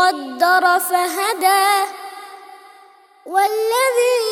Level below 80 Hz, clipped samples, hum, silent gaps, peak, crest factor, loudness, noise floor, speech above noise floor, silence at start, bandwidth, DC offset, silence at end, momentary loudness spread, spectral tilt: -80 dBFS; under 0.1%; none; none; -2 dBFS; 16 dB; -16 LUFS; -48 dBFS; 32 dB; 0 s; over 20 kHz; under 0.1%; 0 s; 17 LU; 1 dB/octave